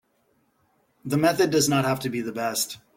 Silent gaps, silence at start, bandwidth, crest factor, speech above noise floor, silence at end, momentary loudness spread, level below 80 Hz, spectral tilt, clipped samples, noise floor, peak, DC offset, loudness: none; 1.05 s; 17 kHz; 18 dB; 44 dB; 0.2 s; 8 LU; -62 dBFS; -4 dB/octave; under 0.1%; -68 dBFS; -8 dBFS; under 0.1%; -23 LUFS